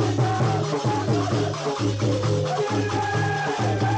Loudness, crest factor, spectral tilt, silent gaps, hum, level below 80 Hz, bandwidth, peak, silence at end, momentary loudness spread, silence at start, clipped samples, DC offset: -24 LUFS; 12 dB; -6 dB/octave; none; none; -52 dBFS; 9.2 kHz; -10 dBFS; 0 s; 2 LU; 0 s; under 0.1%; under 0.1%